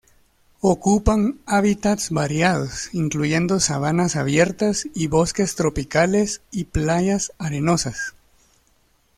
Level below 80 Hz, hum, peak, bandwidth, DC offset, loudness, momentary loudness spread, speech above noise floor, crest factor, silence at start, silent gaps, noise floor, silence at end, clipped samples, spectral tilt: -38 dBFS; none; -2 dBFS; 14.5 kHz; under 0.1%; -21 LUFS; 6 LU; 41 dB; 20 dB; 0.65 s; none; -61 dBFS; 1.1 s; under 0.1%; -5 dB/octave